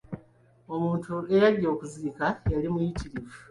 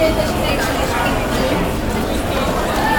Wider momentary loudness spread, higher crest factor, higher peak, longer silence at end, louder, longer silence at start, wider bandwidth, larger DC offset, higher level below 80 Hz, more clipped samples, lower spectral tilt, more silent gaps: first, 17 LU vs 2 LU; about the same, 18 dB vs 14 dB; second, -10 dBFS vs -4 dBFS; about the same, 0.1 s vs 0 s; second, -27 LUFS vs -18 LUFS; about the same, 0.1 s vs 0 s; second, 11.5 kHz vs 18 kHz; neither; second, -44 dBFS vs -26 dBFS; neither; first, -7.5 dB/octave vs -5 dB/octave; neither